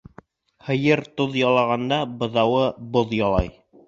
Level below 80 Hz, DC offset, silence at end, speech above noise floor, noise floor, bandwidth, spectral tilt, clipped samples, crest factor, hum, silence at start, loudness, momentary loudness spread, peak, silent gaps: -40 dBFS; under 0.1%; 0.35 s; 29 dB; -50 dBFS; 7.6 kHz; -7 dB/octave; under 0.1%; 18 dB; none; 0.65 s; -21 LUFS; 6 LU; -4 dBFS; none